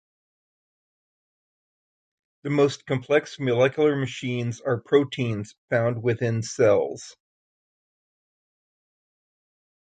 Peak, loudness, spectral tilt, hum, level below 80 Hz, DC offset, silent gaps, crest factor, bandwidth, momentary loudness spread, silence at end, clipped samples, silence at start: -6 dBFS; -24 LUFS; -6 dB/octave; none; -64 dBFS; under 0.1%; 5.58-5.68 s; 20 dB; 9.2 kHz; 9 LU; 2.7 s; under 0.1%; 2.45 s